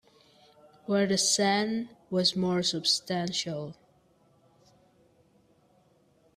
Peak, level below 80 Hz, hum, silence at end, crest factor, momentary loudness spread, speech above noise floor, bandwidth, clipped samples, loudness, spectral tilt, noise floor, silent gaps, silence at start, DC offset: -10 dBFS; -72 dBFS; none; 2.65 s; 20 dB; 12 LU; 37 dB; 15 kHz; under 0.1%; -27 LUFS; -3 dB/octave; -65 dBFS; none; 0.9 s; under 0.1%